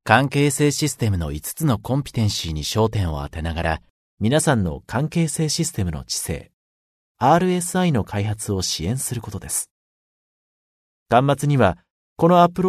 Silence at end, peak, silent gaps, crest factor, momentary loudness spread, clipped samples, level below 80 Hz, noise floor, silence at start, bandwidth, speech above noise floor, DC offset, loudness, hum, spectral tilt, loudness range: 0 s; 0 dBFS; 3.90-4.17 s, 6.54-7.15 s, 9.71-11.06 s, 11.90-12.16 s; 20 dB; 9 LU; under 0.1%; -40 dBFS; under -90 dBFS; 0.05 s; 13.5 kHz; over 70 dB; under 0.1%; -21 LUFS; none; -5 dB/octave; 2 LU